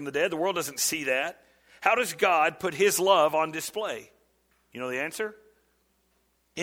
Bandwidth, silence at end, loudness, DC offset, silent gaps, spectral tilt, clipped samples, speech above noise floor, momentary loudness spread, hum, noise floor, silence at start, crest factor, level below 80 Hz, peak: 17.5 kHz; 0 s; -26 LUFS; under 0.1%; none; -2 dB/octave; under 0.1%; 44 dB; 13 LU; 60 Hz at -70 dBFS; -70 dBFS; 0 s; 22 dB; -70 dBFS; -6 dBFS